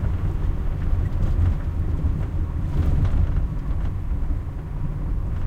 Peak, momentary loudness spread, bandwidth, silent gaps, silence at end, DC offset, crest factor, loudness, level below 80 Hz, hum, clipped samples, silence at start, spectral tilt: -10 dBFS; 7 LU; 4.6 kHz; none; 0 s; under 0.1%; 12 dB; -26 LUFS; -24 dBFS; none; under 0.1%; 0 s; -9 dB/octave